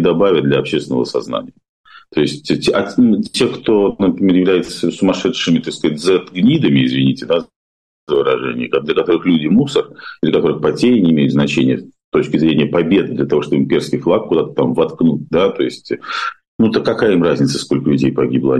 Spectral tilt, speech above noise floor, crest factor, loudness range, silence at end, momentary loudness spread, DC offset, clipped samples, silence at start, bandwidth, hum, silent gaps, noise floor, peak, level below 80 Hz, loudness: -6.5 dB/octave; over 76 dB; 12 dB; 2 LU; 0 s; 7 LU; under 0.1%; under 0.1%; 0 s; 11.5 kHz; none; 1.69-1.84 s, 7.56-8.07 s, 12.04-12.12 s, 16.48-16.59 s; under -90 dBFS; -4 dBFS; -48 dBFS; -15 LUFS